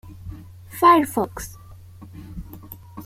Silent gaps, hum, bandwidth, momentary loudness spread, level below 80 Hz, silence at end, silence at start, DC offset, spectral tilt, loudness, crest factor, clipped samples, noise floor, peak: none; none; 16.5 kHz; 26 LU; -46 dBFS; 0 s; 0.05 s; under 0.1%; -5 dB/octave; -18 LUFS; 20 dB; under 0.1%; -42 dBFS; -4 dBFS